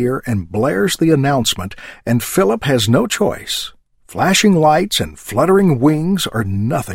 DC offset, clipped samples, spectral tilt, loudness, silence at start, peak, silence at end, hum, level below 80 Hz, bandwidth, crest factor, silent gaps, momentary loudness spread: under 0.1%; under 0.1%; -5 dB/octave; -15 LUFS; 0 s; -2 dBFS; 0 s; none; -42 dBFS; 16.5 kHz; 14 dB; none; 10 LU